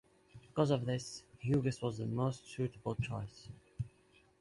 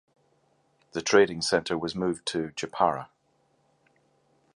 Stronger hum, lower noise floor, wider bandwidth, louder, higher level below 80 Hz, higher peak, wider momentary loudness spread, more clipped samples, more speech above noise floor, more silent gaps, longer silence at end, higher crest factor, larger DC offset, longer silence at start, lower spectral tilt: neither; about the same, -68 dBFS vs -69 dBFS; about the same, 11.5 kHz vs 11 kHz; second, -38 LUFS vs -27 LUFS; about the same, -62 dBFS vs -62 dBFS; second, -18 dBFS vs -6 dBFS; about the same, 13 LU vs 14 LU; neither; second, 32 dB vs 43 dB; neither; second, 0.55 s vs 1.5 s; about the same, 20 dB vs 24 dB; neither; second, 0.35 s vs 0.95 s; first, -7 dB/octave vs -4 dB/octave